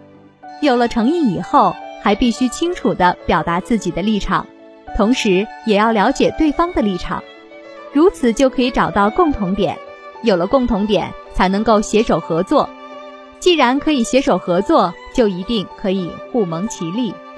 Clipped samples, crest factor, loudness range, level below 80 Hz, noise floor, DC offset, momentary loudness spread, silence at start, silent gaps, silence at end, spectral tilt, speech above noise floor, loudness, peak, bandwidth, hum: under 0.1%; 16 dB; 1 LU; -36 dBFS; -40 dBFS; under 0.1%; 8 LU; 0.45 s; none; 0 s; -5.5 dB/octave; 25 dB; -16 LUFS; 0 dBFS; 11 kHz; none